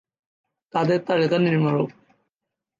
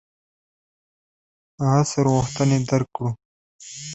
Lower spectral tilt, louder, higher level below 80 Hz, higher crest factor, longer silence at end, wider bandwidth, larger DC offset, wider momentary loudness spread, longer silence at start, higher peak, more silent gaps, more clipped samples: first, -8 dB/octave vs -6 dB/octave; about the same, -22 LUFS vs -21 LUFS; second, -68 dBFS vs -52 dBFS; about the same, 16 dB vs 20 dB; first, 0.9 s vs 0 s; about the same, 7.6 kHz vs 8.2 kHz; neither; second, 8 LU vs 16 LU; second, 0.75 s vs 1.6 s; second, -8 dBFS vs -4 dBFS; second, none vs 3.25-3.59 s; neither